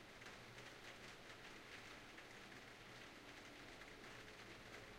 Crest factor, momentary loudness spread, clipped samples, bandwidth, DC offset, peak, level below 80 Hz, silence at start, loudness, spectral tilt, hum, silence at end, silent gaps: 16 dB; 1 LU; under 0.1%; 16 kHz; under 0.1%; -44 dBFS; -74 dBFS; 0 s; -57 LUFS; -3 dB/octave; none; 0 s; none